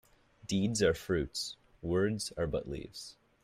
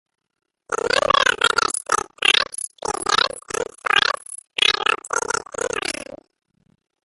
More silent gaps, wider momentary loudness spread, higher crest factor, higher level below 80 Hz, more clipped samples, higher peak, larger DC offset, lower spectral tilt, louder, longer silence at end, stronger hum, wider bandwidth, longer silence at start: neither; first, 16 LU vs 12 LU; about the same, 20 dB vs 22 dB; about the same, -54 dBFS vs -54 dBFS; neither; second, -14 dBFS vs 0 dBFS; neither; first, -5 dB/octave vs 0 dB/octave; second, -34 LUFS vs -20 LUFS; second, 0.3 s vs 1 s; neither; first, 15.5 kHz vs 12 kHz; second, 0.45 s vs 0.7 s